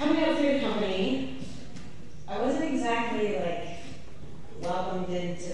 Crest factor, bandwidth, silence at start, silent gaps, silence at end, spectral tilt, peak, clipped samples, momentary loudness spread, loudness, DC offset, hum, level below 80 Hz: 16 dB; 11 kHz; 0 s; none; 0 s; -5.5 dB/octave; -12 dBFS; under 0.1%; 21 LU; -29 LUFS; 2%; none; -54 dBFS